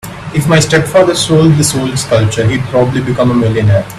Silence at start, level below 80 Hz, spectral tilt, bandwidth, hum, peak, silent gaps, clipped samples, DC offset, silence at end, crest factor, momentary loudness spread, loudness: 0.05 s; -36 dBFS; -5.5 dB/octave; 14.5 kHz; none; 0 dBFS; none; under 0.1%; under 0.1%; 0 s; 10 dB; 5 LU; -10 LUFS